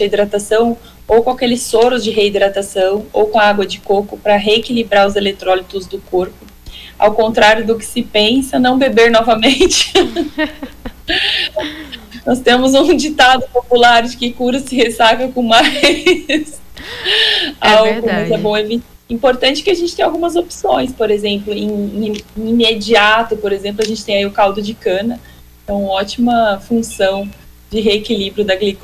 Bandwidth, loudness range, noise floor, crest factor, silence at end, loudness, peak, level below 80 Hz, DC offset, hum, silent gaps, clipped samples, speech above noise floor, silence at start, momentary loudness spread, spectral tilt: 16 kHz; 5 LU; -34 dBFS; 14 dB; 0.05 s; -13 LUFS; 0 dBFS; -40 dBFS; under 0.1%; none; none; under 0.1%; 21 dB; 0 s; 11 LU; -3.5 dB/octave